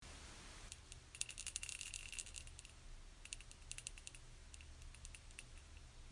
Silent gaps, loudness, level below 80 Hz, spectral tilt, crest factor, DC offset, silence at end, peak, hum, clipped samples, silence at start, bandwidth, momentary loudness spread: none; -52 LUFS; -60 dBFS; -1 dB/octave; 36 dB; under 0.1%; 0 s; -18 dBFS; none; under 0.1%; 0 s; 11.5 kHz; 14 LU